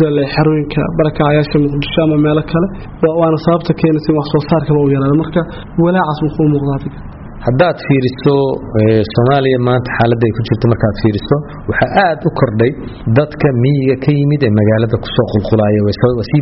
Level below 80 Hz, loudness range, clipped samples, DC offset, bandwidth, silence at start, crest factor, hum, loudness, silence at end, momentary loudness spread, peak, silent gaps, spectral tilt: -34 dBFS; 2 LU; under 0.1%; 0.1%; 5.8 kHz; 0 s; 12 dB; none; -13 LUFS; 0 s; 5 LU; 0 dBFS; none; -6.5 dB/octave